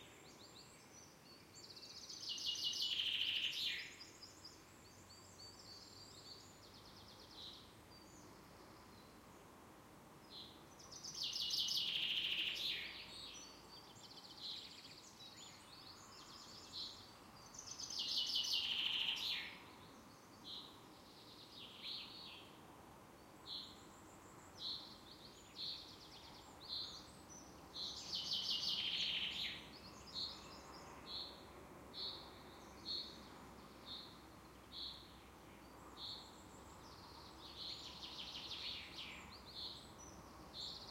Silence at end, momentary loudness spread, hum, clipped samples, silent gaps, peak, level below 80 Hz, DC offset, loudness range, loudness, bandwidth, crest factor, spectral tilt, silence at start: 0 s; 22 LU; none; under 0.1%; none; -26 dBFS; -72 dBFS; under 0.1%; 15 LU; -44 LUFS; 16.5 kHz; 22 dB; -1 dB/octave; 0 s